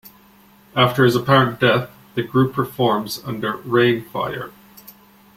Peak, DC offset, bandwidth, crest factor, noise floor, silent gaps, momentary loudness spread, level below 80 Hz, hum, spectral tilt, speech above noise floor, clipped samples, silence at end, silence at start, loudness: 0 dBFS; under 0.1%; 16.5 kHz; 20 dB; -50 dBFS; none; 12 LU; -54 dBFS; none; -6 dB/octave; 32 dB; under 0.1%; 0.85 s; 0.05 s; -19 LUFS